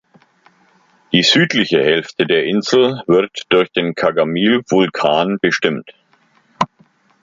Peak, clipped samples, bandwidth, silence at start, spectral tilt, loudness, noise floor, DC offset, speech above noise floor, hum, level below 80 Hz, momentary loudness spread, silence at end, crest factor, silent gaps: 0 dBFS; under 0.1%; 7.6 kHz; 1.1 s; -4.5 dB/octave; -15 LUFS; -56 dBFS; under 0.1%; 41 dB; none; -58 dBFS; 7 LU; 0.55 s; 16 dB; none